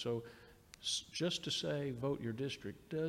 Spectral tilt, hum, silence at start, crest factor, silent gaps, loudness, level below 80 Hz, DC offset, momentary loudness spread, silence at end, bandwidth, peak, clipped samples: -4 dB/octave; none; 0 s; 14 dB; none; -40 LUFS; -68 dBFS; under 0.1%; 13 LU; 0 s; 16 kHz; -26 dBFS; under 0.1%